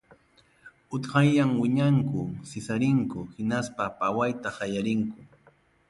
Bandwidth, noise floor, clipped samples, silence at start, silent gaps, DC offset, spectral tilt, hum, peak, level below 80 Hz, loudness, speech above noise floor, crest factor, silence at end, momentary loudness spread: 11.5 kHz; -62 dBFS; under 0.1%; 0.65 s; none; under 0.1%; -7 dB/octave; none; -10 dBFS; -60 dBFS; -27 LUFS; 36 dB; 18 dB; 0.65 s; 12 LU